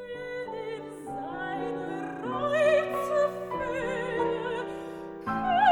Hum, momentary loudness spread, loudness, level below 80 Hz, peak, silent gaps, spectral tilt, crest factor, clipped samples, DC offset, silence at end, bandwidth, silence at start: none; 14 LU; -30 LUFS; -58 dBFS; -10 dBFS; none; -5.5 dB/octave; 18 dB; under 0.1%; under 0.1%; 0 s; 19 kHz; 0 s